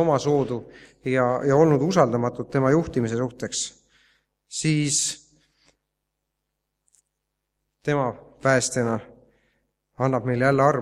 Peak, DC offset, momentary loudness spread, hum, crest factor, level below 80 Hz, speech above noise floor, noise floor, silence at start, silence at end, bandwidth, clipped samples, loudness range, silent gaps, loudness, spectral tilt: -2 dBFS; under 0.1%; 11 LU; 50 Hz at -50 dBFS; 22 dB; -56 dBFS; 58 dB; -80 dBFS; 0 s; 0 s; 14.5 kHz; under 0.1%; 7 LU; none; -23 LUFS; -5 dB/octave